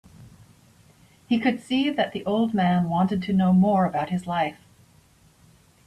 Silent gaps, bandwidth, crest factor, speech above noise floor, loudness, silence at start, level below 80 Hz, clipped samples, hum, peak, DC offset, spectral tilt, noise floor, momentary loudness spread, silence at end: none; 9.8 kHz; 16 dB; 35 dB; -23 LUFS; 0.2 s; -60 dBFS; under 0.1%; none; -10 dBFS; under 0.1%; -7.5 dB/octave; -57 dBFS; 8 LU; 1.3 s